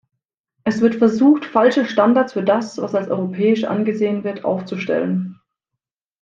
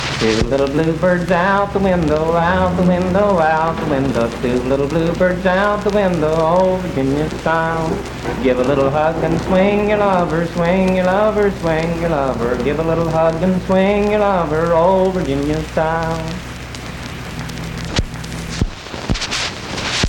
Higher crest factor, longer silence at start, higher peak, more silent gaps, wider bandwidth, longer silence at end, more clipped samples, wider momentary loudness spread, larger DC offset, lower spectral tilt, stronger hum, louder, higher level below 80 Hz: about the same, 18 dB vs 14 dB; first, 0.65 s vs 0 s; about the same, 0 dBFS vs -2 dBFS; neither; second, 7.6 kHz vs 17 kHz; first, 0.85 s vs 0 s; neither; about the same, 9 LU vs 9 LU; neither; about the same, -7 dB/octave vs -6 dB/octave; neither; about the same, -18 LUFS vs -16 LUFS; second, -64 dBFS vs -32 dBFS